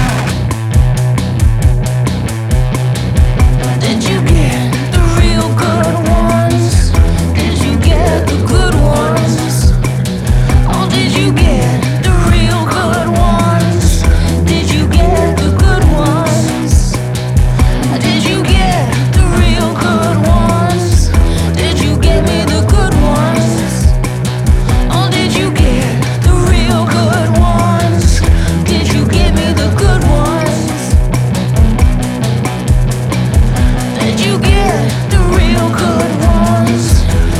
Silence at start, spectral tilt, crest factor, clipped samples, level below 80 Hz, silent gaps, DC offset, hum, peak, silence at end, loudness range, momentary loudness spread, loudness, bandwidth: 0 s; -6 dB/octave; 10 dB; under 0.1%; -14 dBFS; none; under 0.1%; none; 0 dBFS; 0 s; 2 LU; 3 LU; -11 LUFS; 15 kHz